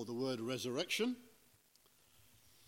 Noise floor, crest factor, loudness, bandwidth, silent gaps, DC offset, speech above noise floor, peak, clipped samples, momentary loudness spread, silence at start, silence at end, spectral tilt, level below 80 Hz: -71 dBFS; 18 dB; -39 LUFS; 16.5 kHz; none; under 0.1%; 31 dB; -24 dBFS; under 0.1%; 4 LU; 0 s; 1.4 s; -4 dB/octave; -84 dBFS